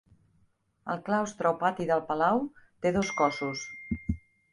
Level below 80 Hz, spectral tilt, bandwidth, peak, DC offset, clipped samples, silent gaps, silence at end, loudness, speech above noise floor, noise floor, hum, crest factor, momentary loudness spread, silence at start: -50 dBFS; -5.5 dB/octave; 11.5 kHz; -10 dBFS; under 0.1%; under 0.1%; none; 0.35 s; -30 LUFS; 40 dB; -69 dBFS; none; 20 dB; 11 LU; 0.85 s